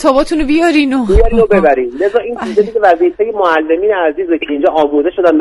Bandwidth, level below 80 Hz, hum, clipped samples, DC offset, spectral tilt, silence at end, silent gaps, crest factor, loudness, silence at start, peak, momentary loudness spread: 12 kHz; -24 dBFS; none; 0.3%; under 0.1%; -6.5 dB/octave; 0 s; none; 10 dB; -12 LUFS; 0 s; 0 dBFS; 4 LU